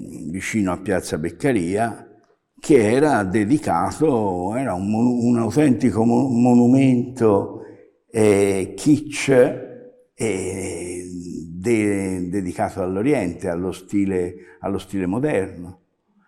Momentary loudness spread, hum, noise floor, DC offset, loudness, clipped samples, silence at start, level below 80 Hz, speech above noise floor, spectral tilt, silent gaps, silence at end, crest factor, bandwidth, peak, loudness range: 14 LU; none; -55 dBFS; under 0.1%; -20 LUFS; under 0.1%; 0 s; -54 dBFS; 36 dB; -6.5 dB/octave; none; 0.55 s; 16 dB; 13.5 kHz; -4 dBFS; 6 LU